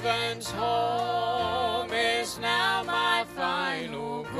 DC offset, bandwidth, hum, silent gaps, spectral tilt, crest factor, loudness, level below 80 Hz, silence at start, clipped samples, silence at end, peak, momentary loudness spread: under 0.1%; 14.5 kHz; none; none; -3 dB/octave; 16 dB; -27 LUFS; -58 dBFS; 0 s; under 0.1%; 0 s; -12 dBFS; 5 LU